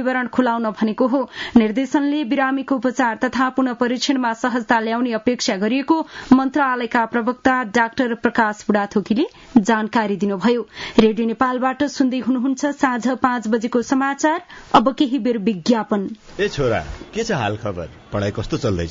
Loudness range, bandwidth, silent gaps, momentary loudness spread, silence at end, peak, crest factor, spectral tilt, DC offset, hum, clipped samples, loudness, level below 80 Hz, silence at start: 1 LU; 7.6 kHz; none; 7 LU; 0 s; -2 dBFS; 18 dB; -5 dB/octave; under 0.1%; none; under 0.1%; -19 LUFS; -48 dBFS; 0 s